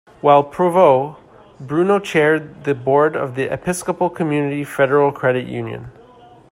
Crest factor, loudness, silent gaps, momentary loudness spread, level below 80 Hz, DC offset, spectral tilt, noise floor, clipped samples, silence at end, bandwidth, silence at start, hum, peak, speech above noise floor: 18 dB; -17 LUFS; none; 10 LU; -56 dBFS; under 0.1%; -6 dB/octave; -45 dBFS; under 0.1%; 0.6 s; 16 kHz; 0.25 s; none; 0 dBFS; 28 dB